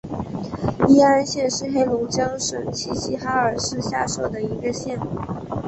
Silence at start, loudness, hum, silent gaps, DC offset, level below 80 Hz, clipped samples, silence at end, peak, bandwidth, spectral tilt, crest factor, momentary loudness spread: 0.05 s; -22 LUFS; none; none; under 0.1%; -46 dBFS; under 0.1%; 0 s; -4 dBFS; 8.4 kHz; -4.5 dB/octave; 18 dB; 13 LU